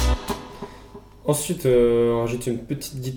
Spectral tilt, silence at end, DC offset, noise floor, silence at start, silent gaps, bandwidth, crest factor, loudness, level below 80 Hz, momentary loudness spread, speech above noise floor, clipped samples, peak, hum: -5.5 dB/octave; 0 s; under 0.1%; -44 dBFS; 0 s; none; 18.5 kHz; 16 dB; -23 LUFS; -32 dBFS; 17 LU; 22 dB; under 0.1%; -8 dBFS; none